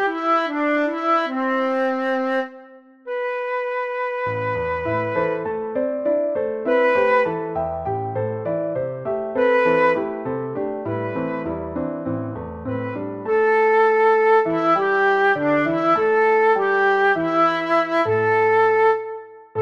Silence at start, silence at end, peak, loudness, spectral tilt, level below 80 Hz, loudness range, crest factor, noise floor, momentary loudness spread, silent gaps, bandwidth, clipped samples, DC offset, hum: 0 s; 0 s; -6 dBFS; -20 LUFS; -7 dB/octave; -54 dBFS; 7 LU; 14 dB; -45 dBFS; 10 LU; none; 7 kHz; under 0.1%; under 0.1%; none